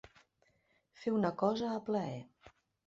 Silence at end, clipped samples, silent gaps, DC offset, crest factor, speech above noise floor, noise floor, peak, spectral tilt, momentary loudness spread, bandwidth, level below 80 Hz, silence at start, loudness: 0.4 s; under 0.1%; none; under 0.1%; 20 dB; 40 dB; -75 dBFS; -18 dBFS; -6 dB/octave; 10 LU; 7.6 kHz; -72 dBFS; 1 s; -36 LUFS